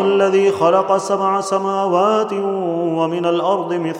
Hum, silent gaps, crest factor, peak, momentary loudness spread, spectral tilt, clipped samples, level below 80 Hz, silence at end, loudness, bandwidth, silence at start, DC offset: none; none; 16 dB; -2 dBFS; 6 LU; -5.5 dB/octave; under 0.1%; -68 dBFS; 0 s; -17 LUFS; 11 kHz; 0 s; under 0.1%